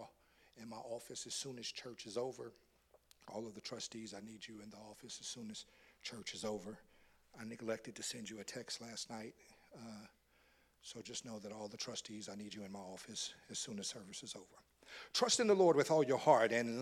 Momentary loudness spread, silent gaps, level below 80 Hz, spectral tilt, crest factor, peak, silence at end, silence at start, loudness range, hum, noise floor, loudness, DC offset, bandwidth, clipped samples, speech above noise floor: 22 LU; none; -80 dBFS; -3 dB/octave; 28 dB; -14 dBFS; 0 s; 0 s; 13 LU; none; -73 dBFS; -40 LUFS; under 0.1%; 16 kHz; under 0.1%; 32 dB